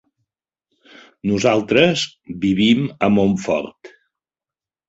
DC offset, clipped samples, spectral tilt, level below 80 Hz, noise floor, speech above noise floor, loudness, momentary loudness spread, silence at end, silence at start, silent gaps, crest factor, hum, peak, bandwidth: under 0.1%; under 0.1%; -5.5 dB/octave; -52 dBFS; under -90 dBFS; over 73 dB; -18 LUFS; 9 LU; 1 s; 1.25 s; none; 18 dB; none; -2 dBFS; 8 kHz